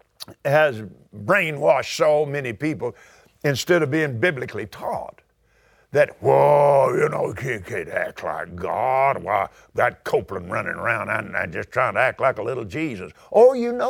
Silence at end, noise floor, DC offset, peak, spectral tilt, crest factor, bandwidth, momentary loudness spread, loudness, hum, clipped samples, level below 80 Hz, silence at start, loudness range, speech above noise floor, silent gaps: 0 s; -60 dBFS; under 0.1%; -2 dBFS; -5.5 dB/octave; 18 dB; 17 kHz; 13 LU; -21 LUFS; none; under 0.1%; -58 dBFS; 0.2 s; 4 LU; 39 dB; none